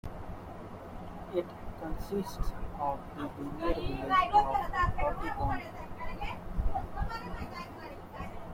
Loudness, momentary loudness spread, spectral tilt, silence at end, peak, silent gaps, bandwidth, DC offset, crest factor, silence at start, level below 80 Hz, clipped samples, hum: -35 LUFS; 16 LU; -6.5 dB/octave; 0 s; -14 dBFS; none; 16.5 kHz; under 0.1%; 20 dB; 0.05 s; -40 dBFS; under 0.1%; none